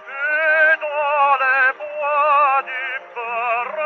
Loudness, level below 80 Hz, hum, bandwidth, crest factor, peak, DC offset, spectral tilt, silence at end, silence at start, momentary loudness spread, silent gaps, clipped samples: -17 LUFS; -86 dBFS; none; 6.4 kHz; 12 dB; -6 dBFS; under 0.1%; 3.5 dB/octave; 0 s; 0 s; 10 LU; none; under 0.1%